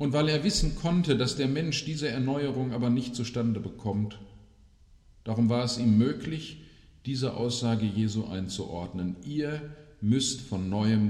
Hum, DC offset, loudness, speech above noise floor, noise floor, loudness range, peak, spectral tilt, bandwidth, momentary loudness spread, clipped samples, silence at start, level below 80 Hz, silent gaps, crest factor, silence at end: none; under 0.1%; -29 LUFS; 29 dB; -57 dBFS; 3 LU; -12 dBFS; -5.5 dB/octave; 12 kHz; 11 LU; under 0.1%; 0 s; -44 dBFS; none; 16 dB; 0 s